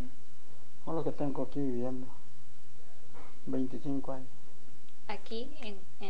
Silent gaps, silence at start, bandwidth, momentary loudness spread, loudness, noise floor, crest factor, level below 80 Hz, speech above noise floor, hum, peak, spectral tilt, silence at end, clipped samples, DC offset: none; 0 s; 10 kHz; 25 LU; -39 LUFS; -61 dBFS; 20 dB; -64 dBFS; 23 dB; none; -18 dBFS; -7.5 dB/octave; 0 s; under 0.1%; 6%